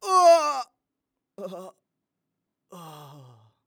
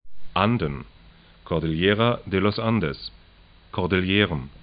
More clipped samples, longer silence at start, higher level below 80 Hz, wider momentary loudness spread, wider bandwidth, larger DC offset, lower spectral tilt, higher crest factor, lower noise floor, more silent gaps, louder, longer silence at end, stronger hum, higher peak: neither; about the same, 0.05 s vs 0.05 s; second, -90 dBFS vs -44 dBFS; first, 27 LU vs 12 LU; first, 18 kHz vs 5.2 kHz; neither; second, -3 dB/octave vs -11 dB/octave; about the same, 18 dB vs 22 dB; first, -84 dBFS vs -52 dBFS; neither; first, -20 LUFS vs -23 LUFS; first, 0.75 s vs 0.05 s; neither; second, -8 dBFS vs -4 dBFS